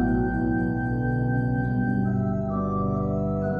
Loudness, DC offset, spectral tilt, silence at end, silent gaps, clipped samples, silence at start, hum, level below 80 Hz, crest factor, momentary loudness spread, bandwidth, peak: -25 LUFS; under 0.1%; -11.5 dB/octave; 0 s; none; under 0.1%; 0 s; none; -38 dBFS; 12 dB; 2 LU; 3.3 kHz; -12 dBFS